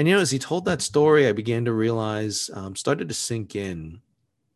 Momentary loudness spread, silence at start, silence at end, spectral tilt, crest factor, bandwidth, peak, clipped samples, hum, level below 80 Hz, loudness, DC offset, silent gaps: 13 LU; 0 s; 0.55 s; -4.5 dB/octave; 18 dB; 12.5 kHz; -6 dBFS; under 0.1%; none; -54 dBFS; -23 LUFS; under 0.1%; none